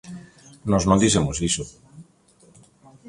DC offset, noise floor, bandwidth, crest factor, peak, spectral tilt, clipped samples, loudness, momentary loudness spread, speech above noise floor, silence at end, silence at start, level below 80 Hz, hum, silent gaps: under 0.1%; -56 dBFS; 11.5 kHz; 20 dB; -4 dBFS; -4.5 dB/octave; under 0.1%; -21 LUFS; 22 LU; 36 dB; 1.05 s; 0.05 s; -42 dBFS; none; none